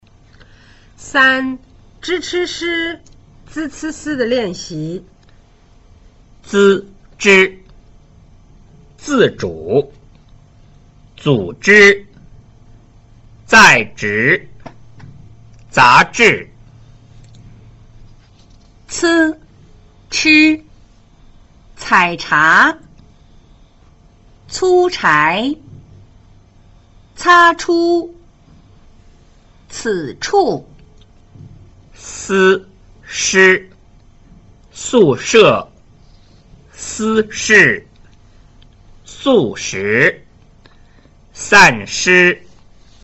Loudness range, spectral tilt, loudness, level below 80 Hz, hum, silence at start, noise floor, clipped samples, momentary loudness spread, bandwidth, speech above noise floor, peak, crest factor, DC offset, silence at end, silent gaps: 8 LU; -3.5 dB/octave; -12 LUFS; -46 dBFS; none; 1 s; -46 dBFS; under 0.1%; 18 LU; 8.2 kHz; 34 dB; 0 dBFS; 16 dB; under 0.1%; 0.65 s; none